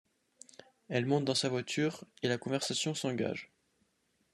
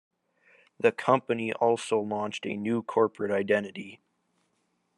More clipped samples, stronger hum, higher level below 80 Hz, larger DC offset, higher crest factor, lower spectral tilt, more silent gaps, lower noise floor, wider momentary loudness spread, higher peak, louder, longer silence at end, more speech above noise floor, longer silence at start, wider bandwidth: neither; neither; about the same, -78 dBFS vs -80 dBFS; neither; about the same, 20 dB vs 22 dB; about the same, -4.5 dB/octave vs -5.5 dB/octave; neither; about the same, -76 dBFS vs -75 dBFS; first, 13 LU vs 7 LU; second, -16 dBFS vs -8 dBFS; second, -34 LUFS vs -28 LUFS; second, 0.9 s vs 1.05 s; second, 43 dB vs 47 dB; about the same, 0.9 s vs 0.8 s; first, 13 kHz vs 11 kHz